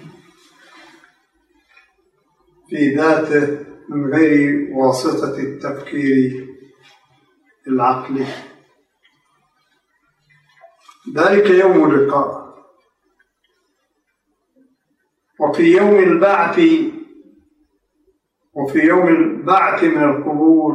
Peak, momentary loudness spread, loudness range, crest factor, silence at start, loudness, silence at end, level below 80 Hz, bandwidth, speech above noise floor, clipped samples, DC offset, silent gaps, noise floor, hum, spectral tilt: -2 dBFS; 15 LU; 9 LU; 16 dB; 0.05 s; -15 LUFS; 0 s; -66 dBFS; 11.5 kHz; 55 dB; under 0.1%; under 0.1%; none; -69 dBFS; none; -6.5 dB/octave